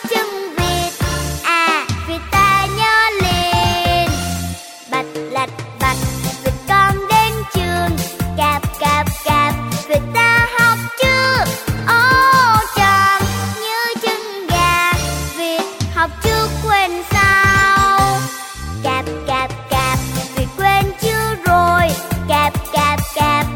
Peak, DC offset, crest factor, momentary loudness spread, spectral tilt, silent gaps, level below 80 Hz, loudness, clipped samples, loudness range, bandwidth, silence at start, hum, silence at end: -2 dBFS; under 0.1%; 14 dB; 10 LU; -4 dB/octave; none; -30 dBFS; -15 LUFS; under 0.1%; 5 LU; 17 kHz; 0 s; none; 0 s